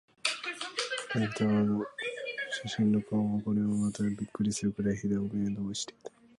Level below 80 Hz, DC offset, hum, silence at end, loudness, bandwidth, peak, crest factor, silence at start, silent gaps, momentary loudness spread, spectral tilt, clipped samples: -62 dBFS; under 0.1%; none; 0.3 s; -32 LUFS; 11.5 kHz; -12 dBFS; 20 dB; 0.25 s; none; 7 LU; -5 dB/octave; under 0.1%